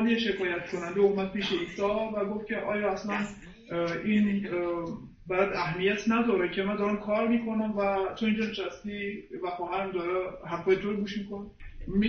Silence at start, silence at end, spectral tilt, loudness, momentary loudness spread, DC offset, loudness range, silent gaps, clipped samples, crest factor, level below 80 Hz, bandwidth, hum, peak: 0 s; 0 s; -6.5 dB/octave; -30 LUFS; 10 LU; under 0.1%; 3 LU; none; under 0.1%; 18 dB; -52 dBFS; 7.8 kHz; none; -12 dBFS